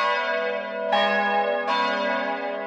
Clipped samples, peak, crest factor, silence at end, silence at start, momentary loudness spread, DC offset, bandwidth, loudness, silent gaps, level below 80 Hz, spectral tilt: under 0.1%; -10 dBFS; 14 dB; 0 s; 0 s; 6 LU; under 0.1%; 8.6 kHz; -23 LUFS; none; -74 dBFS; -4 dB/octave